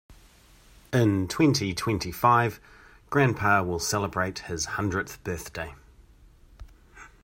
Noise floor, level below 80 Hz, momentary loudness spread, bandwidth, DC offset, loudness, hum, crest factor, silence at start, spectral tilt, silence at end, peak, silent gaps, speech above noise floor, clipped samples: -55 dBFS; -52 dBFS; 12 LU; 16 kHz; under 0.1%; -26 LUFS; none; 22 dB; 0.1 s; -5 dB/octave; 0.15 s; -6 dBFS; none; 30 dB; under 0.1%